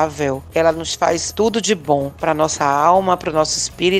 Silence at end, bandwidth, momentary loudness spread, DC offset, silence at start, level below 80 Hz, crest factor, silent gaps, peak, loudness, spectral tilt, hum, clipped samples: 0 s; 15 kHz; 6 LU; under 0.1%; 0 s; -44 dBFS; 16 dB; none; 0 dBFS; -17 LUFS; -3.5 dB/octave; none; under 0.1%